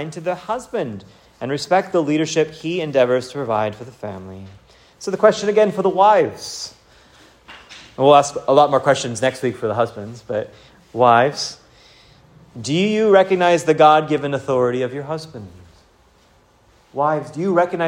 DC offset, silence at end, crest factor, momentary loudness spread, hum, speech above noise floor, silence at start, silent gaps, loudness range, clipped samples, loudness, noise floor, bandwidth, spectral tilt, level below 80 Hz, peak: under 0.1%; 0 s; 18 dB; 19 LU; none; 36 dB; 0 s; none; 5 LU; under 0.1%; -18 LUFS; -54 dBFS; 16 kHz; -5 dB/octave; -58 dBFS; 0 dBFS